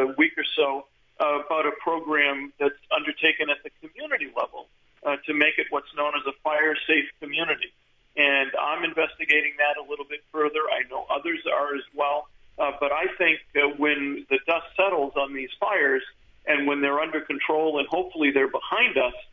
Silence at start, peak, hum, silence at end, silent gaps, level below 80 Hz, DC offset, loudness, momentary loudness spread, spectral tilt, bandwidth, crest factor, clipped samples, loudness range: 0 s; -6 dBFS; none; 0.1 s; none; -64 dBFS; under 0.1%; -24 LUFS; 9 LU; -5 dB/octave; 7.2 kHz; 20 dB; under 0.1%; 2 LU